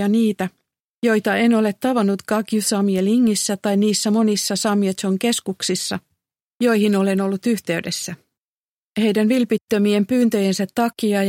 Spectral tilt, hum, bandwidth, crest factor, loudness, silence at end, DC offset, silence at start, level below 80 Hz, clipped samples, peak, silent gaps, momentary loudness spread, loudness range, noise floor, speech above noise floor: -4.5 dB/octave; none; 16.5 kHz; 12 dB; -19 LUFS; 0 s; under 0.1%; 0 s; -66 dBFS; under 0.1%; -6 dBFS; 0.80-1.02 s, 6.43-6.60 s, 8.42-8.92 s, 9.63-9.68 s; 6 LU; 3 LU; under -90 dBFS; over 72 dB